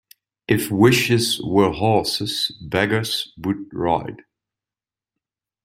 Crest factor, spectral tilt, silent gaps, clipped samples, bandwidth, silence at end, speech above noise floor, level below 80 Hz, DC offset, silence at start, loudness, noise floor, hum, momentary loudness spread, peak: 20 dB; -5 dB/octave; none; under 0.1%; 16 kHz; 1.5 s; over 70 dB; -52 dBFS; under 0.1%; 0.5 s; -20 LUFS; under -90 dBFS; none; 10 LU; -2 dBFS